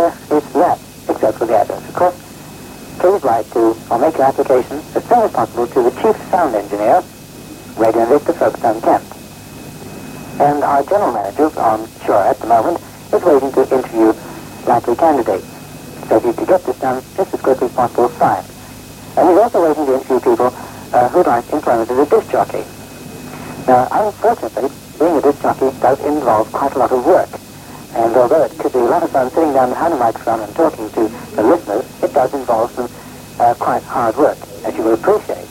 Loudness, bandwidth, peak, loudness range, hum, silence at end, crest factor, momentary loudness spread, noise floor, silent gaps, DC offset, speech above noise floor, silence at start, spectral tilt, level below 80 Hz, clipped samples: -15 LUFS; 16.5 kHz; 0 dBFS; 2 LU; 50 Hz at -50 dBFS; 0 s; 14 dB; 18 LU; -34 dBFS; none; under 0.1%; 20 dB; 0 s; -6 dB/octave; -48 dBFS; under 0.1%